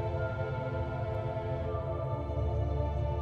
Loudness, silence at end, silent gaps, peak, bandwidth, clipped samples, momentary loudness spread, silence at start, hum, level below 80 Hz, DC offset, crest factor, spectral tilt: -34 LUFS; 0 s; none; -20 dBFS; 6.2 kHz; under 0.1%; 2 LU; 0 s; none; -40 dBFS; under 0.1%; 14 dB; -9.5 dB/octave